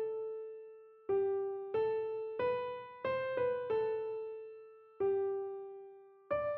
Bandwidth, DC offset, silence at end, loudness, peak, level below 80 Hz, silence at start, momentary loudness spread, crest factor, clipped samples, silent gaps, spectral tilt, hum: 4.5 kHz; under 0.1%; 0 s; -37 LUFS; -24 dBFS; -74 dBFS; 0 s; 17 LU; 14 dB; under 0.1%; none; -4.5 dB/octave; none